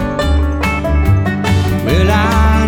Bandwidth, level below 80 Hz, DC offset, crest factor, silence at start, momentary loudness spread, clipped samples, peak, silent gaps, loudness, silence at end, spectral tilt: 16.5 kHz; -18 dBFS; under 0.1%; 12 dB; 0 s; 4 LU; under 0.1%; 0 dBFS; none; -13 LUFS; 0 s; -6.5 dB/octave